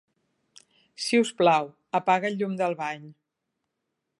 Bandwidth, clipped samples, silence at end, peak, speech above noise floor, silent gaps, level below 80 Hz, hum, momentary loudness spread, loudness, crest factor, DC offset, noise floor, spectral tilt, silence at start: 11.5 kHz; under 0.1%; 1.1 s; -8 dBFS; 57 dB; none; -82 dBFS; none; 12 LU; -25 LUFS; 20 dB; under 0.1%; -82 dBFS; -4.5 dB/octave; 1 s